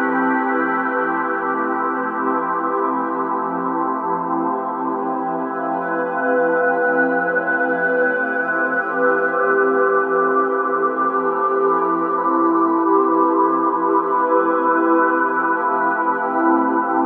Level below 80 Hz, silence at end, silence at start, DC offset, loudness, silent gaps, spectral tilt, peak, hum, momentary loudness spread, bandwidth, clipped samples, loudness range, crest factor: -70 dBFS; 0 s; 0 s; under 0.1%; -18 LUFS; none; -9.5 dB/octave; -4 dBFS; none; 5 LU; 3.7 kHz; under 0.1%; 4 LU; 14 dB